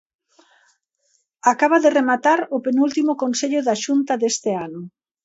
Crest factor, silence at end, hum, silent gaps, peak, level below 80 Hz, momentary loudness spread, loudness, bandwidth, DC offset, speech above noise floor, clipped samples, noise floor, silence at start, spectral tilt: 18 dB; 0.35 s; none; none; -2 dBFS; -72 dBFS; 10 LU; -19 LUFS; 8 kHz; under 0.1%; 48 dB; under 0.1%; -67 dBFS; 1.45 s; -3.5 dB/octave